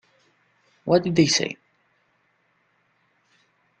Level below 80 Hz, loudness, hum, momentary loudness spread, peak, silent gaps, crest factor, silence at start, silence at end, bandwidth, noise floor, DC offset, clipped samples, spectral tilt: -62 dBFS; -21 LUFS; none; 17 LU; -6 dBFS; none; 22 dB; 0.85 s; 2.25 s; 9 kHz; -67 dBFS; under 0.1%; under 0.1%; -4 dB/octave